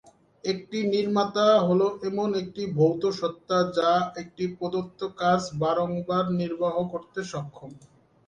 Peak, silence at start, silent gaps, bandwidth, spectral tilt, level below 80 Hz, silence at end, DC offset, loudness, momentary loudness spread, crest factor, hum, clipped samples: -10 dBFS; 0.45 s; none; 9.6 kHz; -6.5 dB/octave; -64 dBFS; 0.5 s; under 0.1%; -26 LUFS; 12 LU; 16 dB; none; under 0.1%